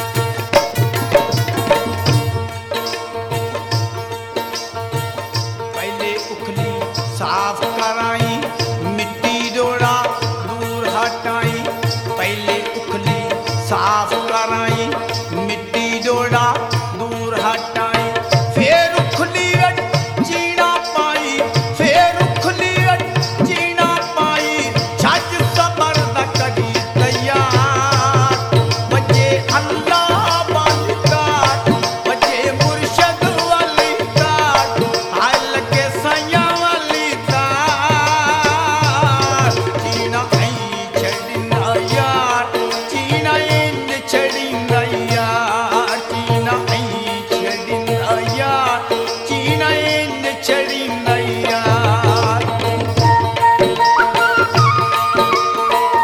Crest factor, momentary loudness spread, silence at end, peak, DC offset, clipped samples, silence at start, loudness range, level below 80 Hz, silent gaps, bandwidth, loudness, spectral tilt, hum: 16 dB; 8 LU; 0 s; 0 dBFS; under 0.1%; under 0.1%; 0 s; 5 LU; -48 dBFS; none; 18 kHz; -16 LUFS; -4.5 dB/octave; none